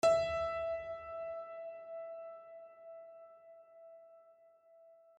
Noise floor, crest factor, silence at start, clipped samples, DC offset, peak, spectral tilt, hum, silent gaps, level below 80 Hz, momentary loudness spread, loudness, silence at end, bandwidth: -64 dBFS; 20 dB; 0.05 s; under 0.1%; under 0.1%; -20 dBFS; -3.5 dB/octave; none; none; -66 dBFS; 23 LU; -39 LUFS; 0.25 s; 10.5 kHz